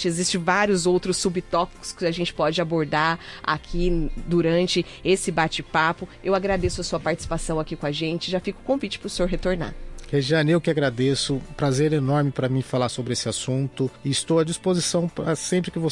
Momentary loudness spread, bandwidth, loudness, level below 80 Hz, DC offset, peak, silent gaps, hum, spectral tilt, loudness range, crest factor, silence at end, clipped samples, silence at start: 6 LU; 11.5 kHz; -24 LUFS; -38 dBFS; under 0.1%; -8 dBFS; none; none; -5 dB/octave; 3 LU; 16 dB; 0 s; under 0.1%; 0 s